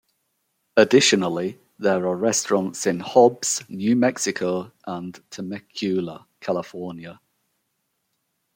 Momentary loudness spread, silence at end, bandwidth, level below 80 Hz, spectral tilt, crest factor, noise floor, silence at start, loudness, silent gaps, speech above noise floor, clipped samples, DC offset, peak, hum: 17 LU; 1.45 s; 16.5 kHz; -70 dBFS; -3.5 dB/octave; 20 dB; -74 dBFS; 0.75 s; -21 LUFS; none; 53 dB; under 0.1%; under 0.1%; -2 dBFS; none